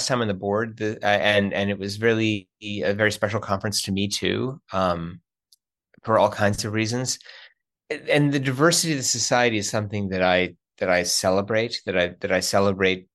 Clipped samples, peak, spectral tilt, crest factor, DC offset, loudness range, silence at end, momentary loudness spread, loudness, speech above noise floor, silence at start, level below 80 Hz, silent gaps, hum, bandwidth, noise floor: under 0.1%; -4 dBFS; -4 dB/octave; 20 dB; under 0.1%; 4 LU; 0.15 s; 9 LU; -23 LUFS; 42 dB; 0 s; -58 dBFS; none; none; 12.5 kHz; -64 dBFS